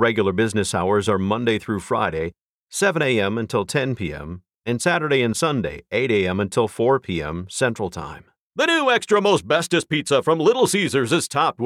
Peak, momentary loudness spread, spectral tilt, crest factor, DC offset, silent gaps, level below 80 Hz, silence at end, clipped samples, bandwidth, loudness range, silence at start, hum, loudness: -6 dBFS; 11 LU; -4.5 dB/octave; 16 dB; under 0.1%; 2.41-2.67 s, 4.56-4.62 s, 8.41-8.51 s; -50 dBFS; 0 s; under 0.1%; 15 kHz; 4 LU; 0 s; none; -21 LUFS